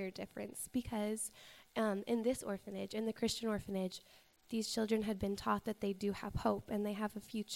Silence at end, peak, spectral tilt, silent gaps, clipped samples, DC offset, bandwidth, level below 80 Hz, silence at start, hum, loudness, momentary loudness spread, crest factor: 0 s; -20 dBFS; -4.5 dB/octave; none; under 0.1%; under 0.1%; 16 kHz; -60 dBFS; 0 s; none; -40 LUFS; 8 LU; 20 dB